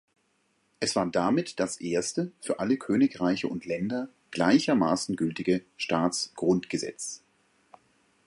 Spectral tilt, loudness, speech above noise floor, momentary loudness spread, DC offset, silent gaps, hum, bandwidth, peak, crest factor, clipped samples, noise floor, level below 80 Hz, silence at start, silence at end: -4.5 dB/octave; -28 LUFS; 44 dB; 9 LU; under 0.1%; none; none; 11.5 kHz; -8 dBFS; 20 dB; under 0.1%; -71 dBFS; -64 dBFS; 0.8 s; 1.1 s